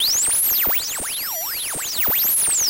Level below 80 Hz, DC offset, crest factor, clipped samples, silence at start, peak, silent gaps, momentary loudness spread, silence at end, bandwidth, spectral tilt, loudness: -50 dBFS; under 0.1%; 10 dB; under 0.1%; 0 s; -10 dBFS; none; 8 LU; 0 s; 16.5 kHz; 1 dB/octave; -18 LUFS